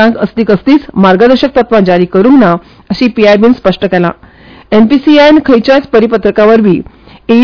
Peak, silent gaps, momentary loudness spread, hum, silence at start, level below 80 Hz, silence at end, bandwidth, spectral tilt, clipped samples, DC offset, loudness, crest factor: 0 dBFS; none; 7 LU; none; 0 s; -36 dBFS; 0 s; 5.4 kHz; -7.5 dB/octave; 10%; 1%; -7 LUFS; 6 dB